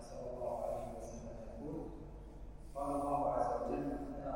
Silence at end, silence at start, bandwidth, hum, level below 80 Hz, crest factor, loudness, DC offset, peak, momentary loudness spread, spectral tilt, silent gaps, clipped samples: 0 s; 0 s; 16 kHz; none; -52 dBFS; 18 dB; -41 LUFS; under 0.1%; -22 dBFS; 17 LU; -7.5 dB/octave; none; under 0.1%